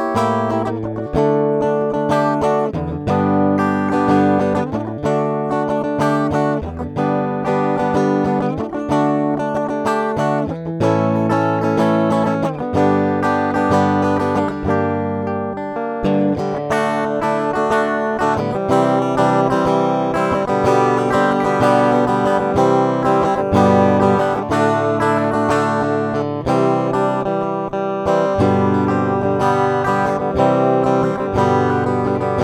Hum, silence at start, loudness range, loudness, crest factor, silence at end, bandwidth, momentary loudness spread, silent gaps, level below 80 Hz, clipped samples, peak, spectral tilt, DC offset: none; 0 s; 3 LU; -17 LUFS; 16 dB; 0 s; 13 kHz; 6 LU; none; -44 dBFS; under 0.1%; 0 dBFS; -7.5 dB/octave; under 0.1%